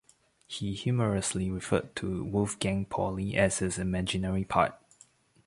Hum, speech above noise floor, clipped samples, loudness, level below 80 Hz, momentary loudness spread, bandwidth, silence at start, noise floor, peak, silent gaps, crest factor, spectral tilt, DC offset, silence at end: none; 32 dB; under 0.1%; -30 LUFS; -50 dBFS; 7 LU; 11.5 kHz; 0.5 s; -61 dBFS; -10 dBFS; none; 22 dB; -5 dB/octave; under 0.1%; 0.7 s